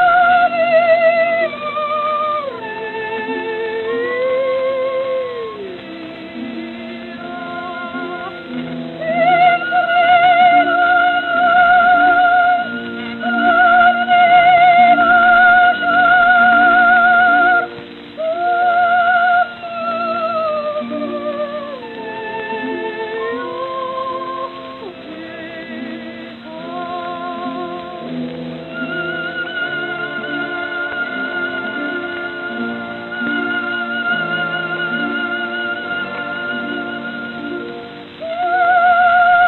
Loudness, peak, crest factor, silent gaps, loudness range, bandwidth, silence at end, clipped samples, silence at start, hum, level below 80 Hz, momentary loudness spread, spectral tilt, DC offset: -15 LUFS; 0 dBFS; 16 dB; none; 15 LU; 4.3 kHz; 0 s; under 0.1%; 0 s; none; -56 dBFS; 18 LU; -7 dB/octave; under 0.1%